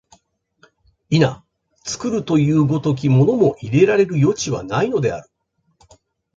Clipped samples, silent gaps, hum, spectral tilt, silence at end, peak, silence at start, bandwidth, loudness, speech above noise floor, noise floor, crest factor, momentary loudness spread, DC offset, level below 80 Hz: under 0.1%; none; none; -6.5 dB/octave; 1.15 s; -2 dBFS; 1.1 s; 7.8 kHz; -18 LUFS; 44 dB; -61 dBFS; 16 dB; 10 LU; under 0.1%; -52 dBFS